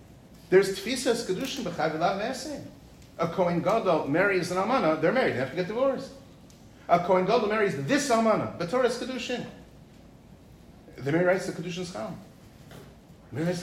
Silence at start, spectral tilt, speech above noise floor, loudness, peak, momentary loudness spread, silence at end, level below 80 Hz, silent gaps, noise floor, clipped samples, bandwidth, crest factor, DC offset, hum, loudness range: 0 s; -5 dB/octave; 25 dB; -27 LUFS; -10 dBFS; 15 LU; 0 s; -58 dBFS; none; -51 dBFS; under 0.1%; 16 kHz; 18 dB; under 0.1%; none; 6 LU